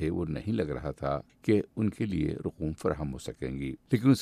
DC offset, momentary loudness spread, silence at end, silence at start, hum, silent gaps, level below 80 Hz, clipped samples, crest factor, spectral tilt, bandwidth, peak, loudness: under 0.1%; 8 LU; 0 s; 0 s; none; none; -48 dBFS; under 0.1%; 18 dB; -7.5 dB/octave; 14 kHz; -12 dBFS; -32 LUFS